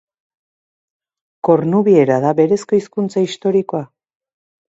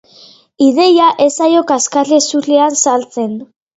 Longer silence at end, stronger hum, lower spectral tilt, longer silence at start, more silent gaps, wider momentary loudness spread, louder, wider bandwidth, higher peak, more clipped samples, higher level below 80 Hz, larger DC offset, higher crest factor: first, 0.85 s vs 0.35 s; neither; first, -7.5 dB/octave vs -2.5 dB/octave; first, 1.45 s vs 0.6 s; neither; about the same, 9 LU vs 11 LU; second, -16 LUFS vs -11 LUFS; about the same, 8 kHz vs 8.2 kHz; about the same, 0 dBFS vs 0 dBFS; neither; about the same, -64 dBFS vs -64 dBFS; neither; about the same, 16 dB vs 12 dB